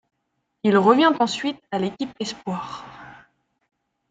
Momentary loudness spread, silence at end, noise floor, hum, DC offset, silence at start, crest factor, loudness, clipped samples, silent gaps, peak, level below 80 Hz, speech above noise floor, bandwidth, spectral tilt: 17 LU; 1 s; -75 dBFS; none; under 0.1%; 0.65 s; 20 dB; -21 LUFS; under 0.1%; none; -2 dBFS; -64 dBFS; 54 dB; 9.2 kHz; -5.5 dB/octave